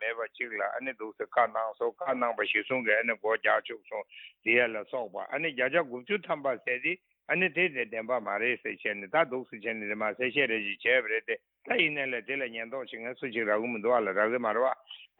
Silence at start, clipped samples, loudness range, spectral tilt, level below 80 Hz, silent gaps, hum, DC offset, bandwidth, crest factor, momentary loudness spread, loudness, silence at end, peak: 0 s; under 0.1%; 1 LU; -8 dB/octave; -84 dBFS; none; none; under 0.1%; 4.2 kHz; 20 dB; 10 LU; -30 LUFS; 0.15 s; -10 dBFS